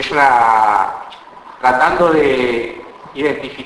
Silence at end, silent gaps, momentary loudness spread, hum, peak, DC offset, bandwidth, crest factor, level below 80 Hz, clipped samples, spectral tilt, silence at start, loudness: 0 s; none; 19 LU; none; 0 dBFS; under 0.1%; 11 kHz; 14 dB; -46 dBFS; under 0.1%; -5 dB/octave; 0 s; -14 LUFS